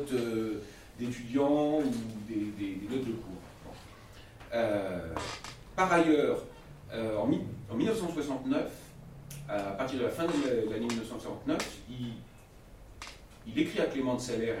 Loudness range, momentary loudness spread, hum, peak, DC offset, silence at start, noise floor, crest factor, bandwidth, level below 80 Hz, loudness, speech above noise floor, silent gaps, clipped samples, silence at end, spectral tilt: 6 LU; 21 LU; none; -12 dBFS; under 0.1%; 0 s; -53 dBFS; 20 dB; 16 kHz; -56 dBFS; -33 LUFS; 21 dB; none; under 0.1%; 0 s; -5.5 dB/octave